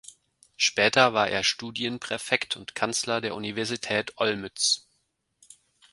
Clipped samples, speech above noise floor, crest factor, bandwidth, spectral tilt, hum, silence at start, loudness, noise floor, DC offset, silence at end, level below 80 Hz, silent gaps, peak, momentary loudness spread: under 0.1%; 47 dB; 26 dB; 11.5 kHz; -2 dB/octave; none; 0.1 s; -25 LUFS; -74 dBFS; under 0.1%; 1.15 s; -66 dBFS; none; -2 dBFS; 10 LU